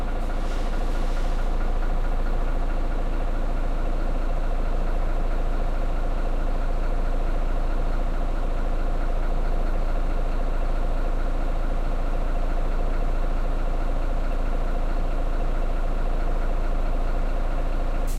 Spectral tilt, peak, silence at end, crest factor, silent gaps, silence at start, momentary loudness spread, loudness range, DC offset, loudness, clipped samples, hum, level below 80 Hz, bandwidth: -7 dB/octave; -14 dBFS; 0 s; 8 dB; none; 0 s; 1 LU; 0 LU; under 0.1%; -30 LUFS; under 0.1%; none; -22 dBFS; 4.9 kHz